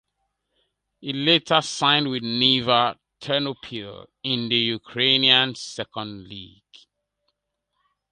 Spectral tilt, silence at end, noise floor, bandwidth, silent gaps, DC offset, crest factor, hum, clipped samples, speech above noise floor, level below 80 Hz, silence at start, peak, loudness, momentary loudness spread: -3.5 dB/octave; 1.65 s; -78 dBFS; 11 kHz; none; under 0.1%; 24 dB; none; under 0.1%; 55 dB; -64 dBFS; 1 s; -2 dBFS; -20 LUFS; 19 LU